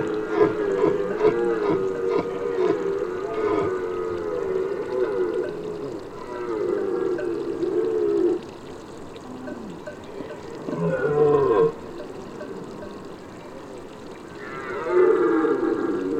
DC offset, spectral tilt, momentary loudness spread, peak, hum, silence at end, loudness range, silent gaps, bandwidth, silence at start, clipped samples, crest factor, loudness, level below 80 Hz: under 0.1%; -7.5 dB/octave; 18 LU; -4 dBFS; none; 0 s; 5 LU; none; 9.2 kHz; 0 s; under 0.1%; 20 dB; -24 LUFS; -54 dBFS